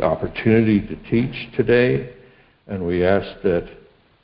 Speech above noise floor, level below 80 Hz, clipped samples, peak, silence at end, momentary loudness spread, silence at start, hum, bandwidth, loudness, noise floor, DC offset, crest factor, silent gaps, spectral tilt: 31 dB; -42 dBFS; under 0.1%; -2 dBFS; 0.5 s; 11 LU; 0 s; none; 5.4 kHz; -20 LUFS; -50 dBFS; under 0.1%; 18 dB; none; -12 dB/octave